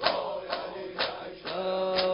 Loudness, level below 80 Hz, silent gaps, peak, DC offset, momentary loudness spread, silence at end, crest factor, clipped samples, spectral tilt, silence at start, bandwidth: -32 LUFS; -62 dBFS; none; -8 dBFS; under 0.1%; 8 LU; 0 s; 22 dB; under 0.1%; -7.5 dB/octave; 0 s; 5.6 kHz